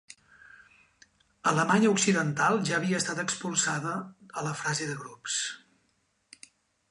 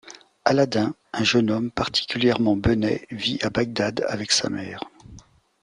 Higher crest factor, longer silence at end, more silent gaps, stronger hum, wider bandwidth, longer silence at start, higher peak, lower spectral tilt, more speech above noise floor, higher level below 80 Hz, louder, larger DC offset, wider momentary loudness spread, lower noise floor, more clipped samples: about the same, 20 dB vs 20 dB; first, 1.35 s vs 0.45 s; neither; neither; about the same, 11.5 kHz vs 11 kHz; first, 1.45 s vs 0.05 s; second, -10 dBFS vs -2 dBFS; about the same, -3.5 dB/octave vs -4.5 dB/octave; first, 45 dB vs 26 dB; second, -72 dBFS vs -48 dBFS; second, -28 LUFS vs -23 LUFS; neither; first, 13 LU vs 8 LU; first, -73 dBFS vs -49 dBFS; neither